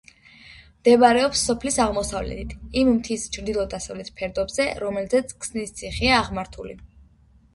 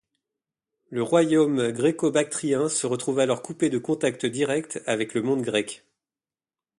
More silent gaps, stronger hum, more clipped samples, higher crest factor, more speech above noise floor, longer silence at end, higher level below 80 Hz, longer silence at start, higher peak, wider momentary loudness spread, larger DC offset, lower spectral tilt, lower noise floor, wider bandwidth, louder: neither; neither; neither; about the same, 20 dB vs 18 dB; second, 33 dB vs over 66 dB; second, 0.7 s vs 1.05 s; first, -42 dBFS vs -70 dBFS; second, 0.45 s vs 0.9 s; first, -2 dBFS vs -8 dBFS; first, 15 LU vs 7 LU; neither; about the same, -3.5 dB/octave vs -4.5 dB/octave; second, -55 dBFS vs under -90 dBFS; about the same, 11.5 kHz vs 11.5 kHz; about the same, -22 LUFS vs -24 LUFS